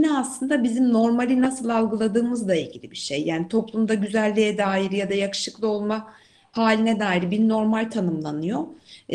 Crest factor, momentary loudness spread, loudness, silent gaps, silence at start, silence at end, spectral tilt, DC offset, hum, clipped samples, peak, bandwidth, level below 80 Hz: 18 dB; 8 LU; -23 LUFS; none; 0 s; 0 s; -5.5 dB/octave; under 0.1%; none; under 0.1%; -4 dBFS; 11.5 kHz; -64 dBFS